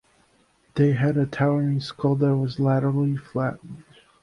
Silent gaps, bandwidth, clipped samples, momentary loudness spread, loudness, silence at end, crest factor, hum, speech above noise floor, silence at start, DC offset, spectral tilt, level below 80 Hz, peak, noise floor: none; 6.6 kHz; under 0.1%; 8 LU; -23 LUFS; 0.4 s; 14 dB; none; 40 dB; 0.75 s; under 0.1%; -9 dB/octave; -58 dBFS; -8 dBFS; -62 dBFS